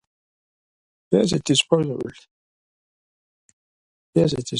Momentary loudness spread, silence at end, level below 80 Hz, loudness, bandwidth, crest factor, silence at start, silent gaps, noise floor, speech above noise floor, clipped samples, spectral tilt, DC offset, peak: 11 LU; 0 s; -56 dBFS; -21 LUFS; 11.5 kHz; 20 dB; 1.1 s; 2.31-4.13 s; under -90 dBFS; over 70 dB; under 0.1%; -5 dB/octave; under 0.1%; -4 dBFS